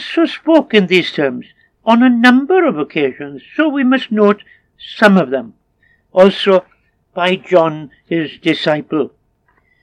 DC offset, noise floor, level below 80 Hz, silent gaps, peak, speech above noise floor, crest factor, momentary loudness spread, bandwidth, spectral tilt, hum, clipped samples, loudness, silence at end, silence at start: under 0.1%; -58 dBFS; -62 dBFS; none; 0 dBFS; 46 dB; 14 dB; 12 LU; 11 kHz; -6.5 dB/octave; none; under 0.1%; -13 LUFS; 0.75 s; 0 s